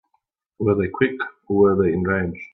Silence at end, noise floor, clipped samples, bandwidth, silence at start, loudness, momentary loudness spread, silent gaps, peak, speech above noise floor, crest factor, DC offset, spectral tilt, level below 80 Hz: 0.1 s; -71 dBFS; under 0.1%; 4.1 kHz; 0.6 s; -21 LUFS; 7 LU; none; -4 dBFS; 51 dB; 18 dB; under 0.1%; -10.5 dB/octave; -58 dBFS